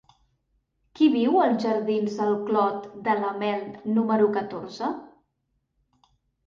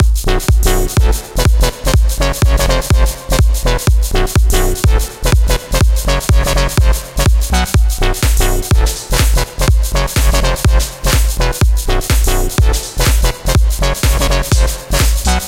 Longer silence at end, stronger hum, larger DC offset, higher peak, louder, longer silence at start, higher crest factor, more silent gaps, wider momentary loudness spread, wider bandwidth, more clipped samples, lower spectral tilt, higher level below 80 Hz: first, 1.4 s vs 0 s; neither; neither; second, -10 dBFS vs 0 dBFS; second, -25 LUFS vs -14 LUFS; first, 0.95 s vs 0 s; about the same, 16 dB vs 12 dB; neither; first, 10 LU vs 2 LU; second, 7.2 kHz vs 16.5 kHz; neither; first, -7 dB/octave vs -4.5 dB/octave; second, -70 dBFS vs -12 dBFS